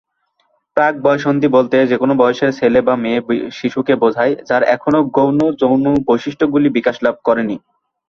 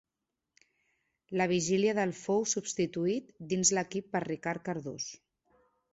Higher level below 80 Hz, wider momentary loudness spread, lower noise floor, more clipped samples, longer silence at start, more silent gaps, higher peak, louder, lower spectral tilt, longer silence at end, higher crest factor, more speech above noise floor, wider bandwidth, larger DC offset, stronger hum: first, -52 dBFS vs -70 dBFS; second, 5 LU vs 10 LU; second, -64 dBFS vs -88 dBFS; neither; second, 0.75 s vs 1.3 s; neither; first, -2 dBFS vs -14 dBFS; first, -15 LUFS vs -32 LUFS; first, -7 dB/octave vs -4 dB/octave; second, 0.5 s vs 0.8 s; second, 14 dB vs 20 dB; second, 50 dB vs 56 dB; second, 6.8 kHz vs 8.2 kHz; neither; neither